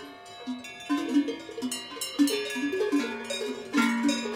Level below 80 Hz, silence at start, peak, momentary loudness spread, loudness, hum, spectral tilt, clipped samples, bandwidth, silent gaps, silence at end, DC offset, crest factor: -72 dBFS; 0 s; -12 dBFS; 12 LU; -29 LUFS; none; -2.5 dB/octave; under 0.1%; 16.5 kHz; none; 0 s; under 0.1%; 18 dB